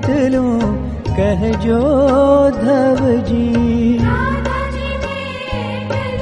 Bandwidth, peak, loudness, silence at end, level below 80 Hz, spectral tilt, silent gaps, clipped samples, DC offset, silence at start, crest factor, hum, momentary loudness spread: 9.4 kHz; -2 dBFS; -15 LUFS; 0 s; -28 dBFS; -7.5 dB/octave; none; under 0.1%; under 0.1%; 0 s; 14 dB; none; 10 LU